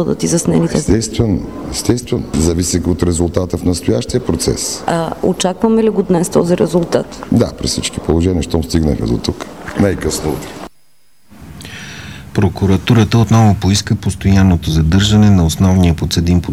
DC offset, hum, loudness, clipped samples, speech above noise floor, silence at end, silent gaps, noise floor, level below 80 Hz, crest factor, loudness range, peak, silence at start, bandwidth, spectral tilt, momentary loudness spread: 0.7%; none; -14 LUFS; under 0.1%; 43 dB; 0 s; none; -56 dBFS; -28 dBFS; 14 dB; 7 LU; 0 dBFS; 0 s; 15.5 kHz; -5.5 dB/octave; 10 LU